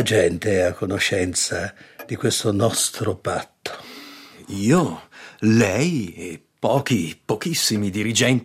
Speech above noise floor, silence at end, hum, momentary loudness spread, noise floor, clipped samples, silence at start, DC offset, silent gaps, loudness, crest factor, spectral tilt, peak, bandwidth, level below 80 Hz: 21 dB; 0 s; none; 17 LU; -42 dBFS; under 0.1%; 0 s; under 0.1%; none; -21 LUFS; 16 dB; -4 dB/octave; -6 dBFS; 16 kHz; -58 dBFS